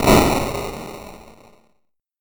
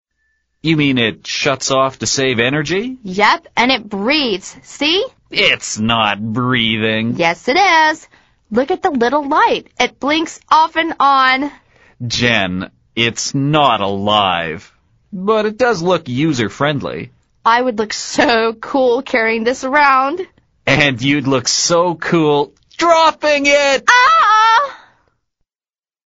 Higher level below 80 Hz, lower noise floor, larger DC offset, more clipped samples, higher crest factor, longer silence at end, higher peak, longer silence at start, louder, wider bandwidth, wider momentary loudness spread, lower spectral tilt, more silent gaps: first, -32 dBFS vs -48 dBFS; second, -68 dBFS vs under -90 dBFS; neither; neither; about the same, 20 dB vs 16 dB; second, 0.9 s vs 1.3 s; about the same, -2 dBFS vs 0 dBFS; second, 0 s vs 0.65 s; second, -19 LUFS vs -14 LUFS; first, over 20 kHz vs 8.2 kHz; first, 23 LU vs 10 LU; first, -5 dB/octave vs -3.5 dB/octave; neither